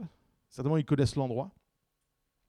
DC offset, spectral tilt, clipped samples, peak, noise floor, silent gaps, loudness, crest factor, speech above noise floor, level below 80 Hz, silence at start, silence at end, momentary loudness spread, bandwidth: under 0.1%; -7.5 dB/octave; under 0.1%; -16 dBFS; -81 dBFS; none; -31 LUFS; 18 dB; 51 dB; -56 dBFS; 0 s; 1 s; 19 LU; 11.5 kHz